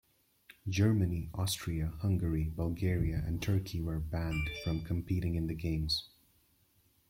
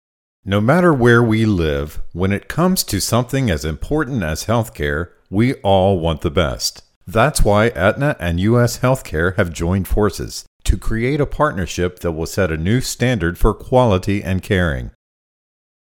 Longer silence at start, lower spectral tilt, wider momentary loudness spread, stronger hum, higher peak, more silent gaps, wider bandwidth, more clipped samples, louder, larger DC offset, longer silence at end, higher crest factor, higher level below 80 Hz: first, 0.65 s vs 0.45 s; about the same, -6 dB/octave vs -5.5 dB/octave; about the same, 6 LU vs 8 LU; neither; second, -16 dBFS vs 0 dBFS; second, none vs 6.96-7.01 s, 10.47-10.60 s; about the same, 16.5 kHz vs 18 kHz; neither; second, -34 LUFS vs -18 LUFS; neither; about the same, 1 s vs 1.05 s; about the same, 18 dB vs 16 dB; second, -46 dBFS vs -28 dBFS